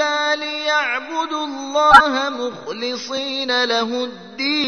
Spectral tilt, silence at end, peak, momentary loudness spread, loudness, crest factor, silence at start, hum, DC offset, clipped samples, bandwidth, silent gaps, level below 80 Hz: -2 dB/octave; 0 s; 0 dBFS; 15 LU; -18 LUFS; 18 dB; 0 s; none; 0.2%; 0.2%; 11 kHz; none; -50 dBFS